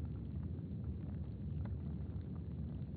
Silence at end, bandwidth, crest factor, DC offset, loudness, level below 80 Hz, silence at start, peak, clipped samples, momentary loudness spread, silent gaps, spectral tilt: 0 s; 4.4 kHz; 12 dB; under 0.1%; -45 LUFS; -50 dBFS; 0 s; -32 dBFS; under 0.1%; 2 LU; none; -11 dB/octave